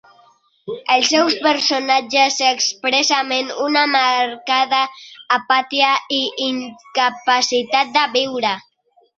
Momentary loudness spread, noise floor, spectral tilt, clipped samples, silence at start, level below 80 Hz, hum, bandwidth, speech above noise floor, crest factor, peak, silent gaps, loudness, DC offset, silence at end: 8 LU; -54 dBFS; -0.5 dB/octave; under 0.1%; 0.65 s; -68 dBFS; none; 7.8 kHz; 36 dB; 16 dB; -2 dBFS; none; -16 LUFS; under 0.1%; 0.55 s